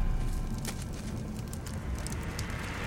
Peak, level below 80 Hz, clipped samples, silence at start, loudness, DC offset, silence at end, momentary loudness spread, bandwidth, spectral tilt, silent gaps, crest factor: -18 dBFS; -36 dBFS; under 0.1%; 0 s; -37 LUFS; under 0.1%; 0 s; 3 LU; 17 kHz; -5 dB/octave; none; 16 dB